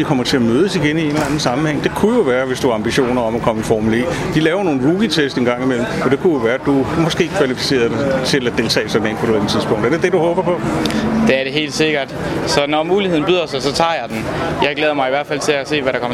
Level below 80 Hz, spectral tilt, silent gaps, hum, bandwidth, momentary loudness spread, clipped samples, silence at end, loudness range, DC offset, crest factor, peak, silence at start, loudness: -40 dBFS; -5 dB/octave; none; none; 15 kHz; 3 LU; under 0.1%; 0 s; 1 LU; under 0.1%; 16 dB; 0 dBFS; 0 s; -16 LUFS